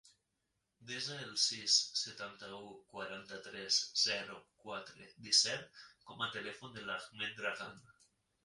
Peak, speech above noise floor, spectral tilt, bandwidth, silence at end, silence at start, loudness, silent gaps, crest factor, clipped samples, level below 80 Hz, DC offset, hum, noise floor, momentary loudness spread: -14 dBFS; 45 dB; 0 dB/octave; 11.5 kHz; 0.65 s; 0.05 s; -35 LUFS; none; 26 dB; under 0.1%; -80 dBFS; under 0.1%; none; -85 dBFS; 21 LU